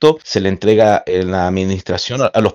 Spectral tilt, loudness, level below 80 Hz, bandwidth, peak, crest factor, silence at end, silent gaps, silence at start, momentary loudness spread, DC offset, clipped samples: -5.5 dB/octave; -15 LUFS; -46 dBFS; 8 kHz; 0 dBFS; 14 dB; 0 s; none; 0 s; 7 LU; under 0.1%; 0.3%